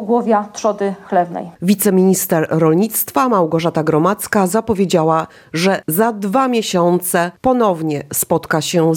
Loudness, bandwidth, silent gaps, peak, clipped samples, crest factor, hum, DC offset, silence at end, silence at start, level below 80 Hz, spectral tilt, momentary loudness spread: -16 LUFS; 17.5 kHz; none; -2 dBFS; under 0.1%; 14 dB; none; under 0.1%; 0 s; 0 s; -52 dBFS; -5 dB/octave; 5 LU